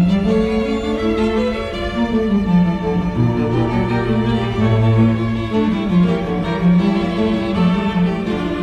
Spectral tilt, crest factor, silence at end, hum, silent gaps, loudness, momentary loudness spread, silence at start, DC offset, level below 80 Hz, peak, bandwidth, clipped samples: -8.5 dB/octave; 12 dB; 0 s; none; none; -17 LUFS; 5 LU; 0 s; under 0.1%; -32 dBFS; -4 dBFS; 8.4 kHz; under 0.1%